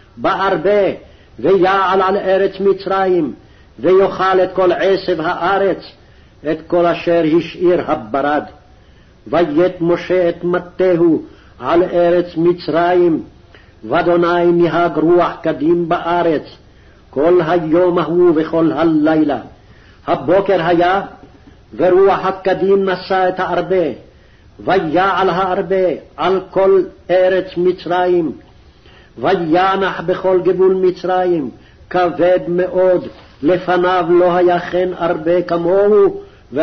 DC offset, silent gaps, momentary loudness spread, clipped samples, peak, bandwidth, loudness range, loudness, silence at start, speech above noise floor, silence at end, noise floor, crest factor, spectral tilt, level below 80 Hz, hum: under 0.1%; none; 7 LU; under 0.1%; -4 dBFS; 6.2 kHz; 2 LU; -14 LUFS; 0.15 s; 31 dB; 0 s; -45 dBFS; 12 dB; -8 dB/octave; -46 dBFS; none